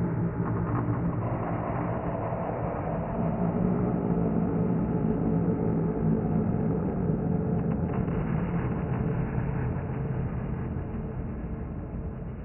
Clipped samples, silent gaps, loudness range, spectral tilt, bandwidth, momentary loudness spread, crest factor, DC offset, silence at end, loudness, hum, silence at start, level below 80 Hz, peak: under 0.1%; none; 4 LU; -8 dB/octave; 3 kHz; 8 LU; 16 dB; under 0.1%; 0 s; -29 LUFS; none; 0 s; -40 dBFS; -12 dBFS